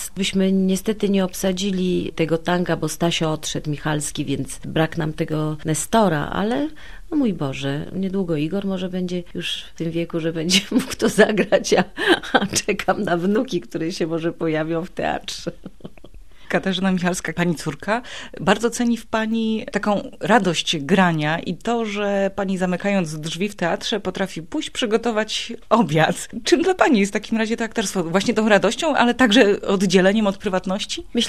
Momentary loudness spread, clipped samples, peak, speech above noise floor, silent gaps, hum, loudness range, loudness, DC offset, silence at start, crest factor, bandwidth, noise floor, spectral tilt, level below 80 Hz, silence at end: 9 LU; under 0.1%; 0 dBFS; 23 dB; none; none; 6 LU; -21 LUFS; 1%; 0 s; 20 dB; 14.5 kHz; -44 dBFS; -4.5 dB/octave; -46 dBFS; 0 s